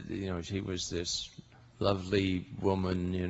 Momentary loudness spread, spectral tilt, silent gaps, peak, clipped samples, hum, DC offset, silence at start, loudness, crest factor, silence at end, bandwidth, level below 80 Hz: 6 LU; -5 dB/octave; none; -12 dBFS; under 0.1%; none; under 0.1%; 0 s; -33 LUFS; 22 dB; 0 s; 8.2 kHz; -54 dBFS